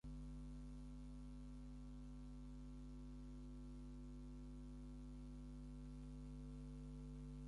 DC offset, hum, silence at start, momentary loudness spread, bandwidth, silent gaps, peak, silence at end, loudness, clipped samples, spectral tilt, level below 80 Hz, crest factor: under 0.1%; 50 Hz at -55 dBFS; 0.05 s; 2 LU; 11 kHz; none; -46 dBFS; 0 s; -57 LUFS; under 0.1%; -7.5 dB/octave; -56 dBFS; 8 dB